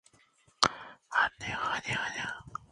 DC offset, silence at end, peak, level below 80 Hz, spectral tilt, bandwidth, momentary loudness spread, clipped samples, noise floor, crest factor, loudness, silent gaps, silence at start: under 0.1%; 0.05 s; -2 dBFS; -62 dBFS; -2 dB/octave; 11.5 kHz; 9 LU; under 0.1%; -66 dBFS; 32 dB; -31 LUFS; none; 0.6 s